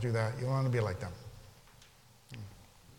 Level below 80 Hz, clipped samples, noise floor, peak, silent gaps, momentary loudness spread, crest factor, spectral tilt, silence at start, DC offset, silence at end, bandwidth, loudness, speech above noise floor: -60 dBFS; under 0.1%; -61 dBFS; -20 dBFS; none; 21 LU; 18 dB; -7 dB/octave; 0 s; under 0.1%; 0.05 s; 16 kHz; -34 LUFS; 28 dB